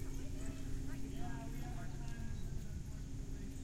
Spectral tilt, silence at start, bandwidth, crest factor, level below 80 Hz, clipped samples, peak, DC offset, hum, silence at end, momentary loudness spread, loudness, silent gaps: -6 dB/octave; 0 s; 16 kHz; 12 dB; -46 dBFS; under 0.1%; -30 dBFS; under 0.1%; none; 0 s; 2 LU; -47 LUFS; none